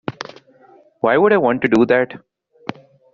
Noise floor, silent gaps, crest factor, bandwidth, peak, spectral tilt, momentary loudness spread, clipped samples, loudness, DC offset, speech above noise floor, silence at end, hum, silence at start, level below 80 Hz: -50 dBFS; none; 16 dB; 7.6 kHz; -2 dBFS; -4.5 dB/octave; 19 LU; under 0.1%; -16 LUFS; under 0.1%; 35 dB; 0.95 s; none; 0.1 s; -58 dBFS